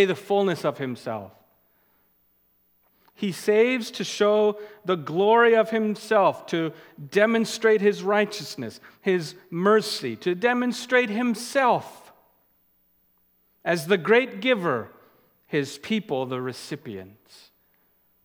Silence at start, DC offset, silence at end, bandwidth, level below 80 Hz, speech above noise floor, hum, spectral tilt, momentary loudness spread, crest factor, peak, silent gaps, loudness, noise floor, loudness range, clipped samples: 0 s; under 0.1%; 1.2 s; 18.5 kHz; -78 dBFS; 42 dB; none; -5 dB/octave; 14 LU; 20 dB; -4 dBFS; none; -23 LUFS; -66 dBFS; 7 LU; under 0.1%